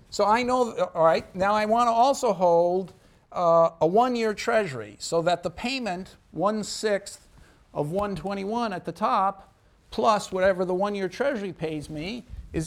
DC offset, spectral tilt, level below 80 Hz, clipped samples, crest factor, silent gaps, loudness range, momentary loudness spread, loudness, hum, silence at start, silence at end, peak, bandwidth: under 0.1%; -5 dB/octave; -52 dBFS; under 0.1%; 16 dB; none; 7 LU; 13 LU; -25 LUFS; none; 0.1 s; 0 s; -8 dBFS; 15.5 kHz